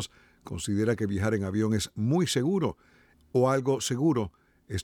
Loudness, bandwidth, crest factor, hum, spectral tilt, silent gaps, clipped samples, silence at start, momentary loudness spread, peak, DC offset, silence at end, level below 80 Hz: -28 LUFS; 17.5 kHz; 16 dB; none; -5.5 dB/octave; none; under 0.1%; 0 s; 11 LU; -12 dBFS; under 0.1%; 0 s; -56 dBFS